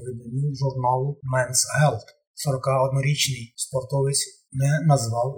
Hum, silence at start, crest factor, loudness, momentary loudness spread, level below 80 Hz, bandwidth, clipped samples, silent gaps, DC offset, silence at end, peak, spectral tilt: none; 0 s; 18 dB; -23 LUFS; 8 LU; -60 dBFS; 18.5 kHz; under 0.1%; 2.27-2.34 s; under 0.1%; 0 s; -6 dBFS; -4.5 dB/octave